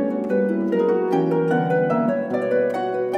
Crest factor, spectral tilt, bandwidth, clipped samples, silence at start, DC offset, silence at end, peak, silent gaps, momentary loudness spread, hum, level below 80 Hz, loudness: 12 dB; -8.5 dB/octave; 8 kHz; under 0.1%; 0 s; under 0.1%; 0 s; -8 dBFS; none; 3 LU; none; -68 dBFS; -21 LUFS